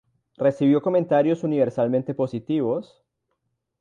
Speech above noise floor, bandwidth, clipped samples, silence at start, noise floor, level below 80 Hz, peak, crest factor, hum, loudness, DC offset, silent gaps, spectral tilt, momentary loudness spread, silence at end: 54 dB; 7.4 kHz; under 0.1%; 0.4 s; -76 dBFS; -68 dBFS; -8 dBFS; 16 dB; none; -22 LUFS; under 0.1%; none; -9 dB/octave; 7 LU; 0.95 s